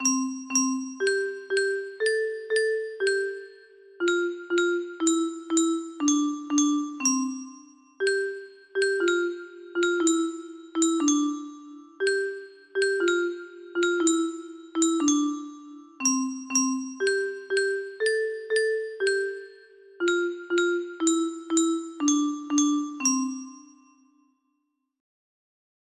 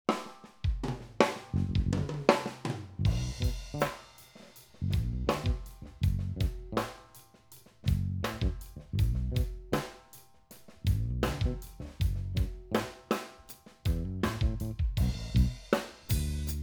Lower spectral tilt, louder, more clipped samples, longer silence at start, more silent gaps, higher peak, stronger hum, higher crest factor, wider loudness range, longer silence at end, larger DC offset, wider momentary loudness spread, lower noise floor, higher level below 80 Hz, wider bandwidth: second, -0.5 dB/octave vs -6 dB/octave; first, -26 LUFS vs -33 LUFS; neither; about the same, 0 s vs 0.1 s; neither; second, -10 dBFS vs -4 dBFS; neither; second, 16 dB vs 28 dB; about the same, 2 LU vs 3 LU; first, 2.35 s vs 0 s; neither; second, 11 LU vs 14 LU; first, -77 dBFS vs -57 dBFS; second, -76 dBFS vs -38 dBFS; second, 15 kHz vs over 20 kHz